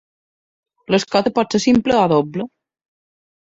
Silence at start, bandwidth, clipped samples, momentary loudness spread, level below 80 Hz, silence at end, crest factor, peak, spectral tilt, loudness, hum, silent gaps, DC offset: 0.9 s; 8 kHz; under 0.1%; 11 LU; -52 dBFS; 1.05 s; 18 dB; -2 dBFS; -5.5 dB/octave; -17 LUFS; none; none; under 0.1%